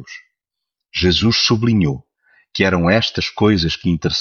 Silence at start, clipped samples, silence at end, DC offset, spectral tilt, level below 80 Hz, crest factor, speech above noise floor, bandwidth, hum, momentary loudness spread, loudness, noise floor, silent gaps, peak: 0 s; under 0.1%; 0 s; under 0.1%; -5.5 dB/octave; -38 dBFS; 16 dB; 65 dB; 7.2 kHz; none; 11 LU; -16 LUFS; -82 dBFS; none; -2 dBFS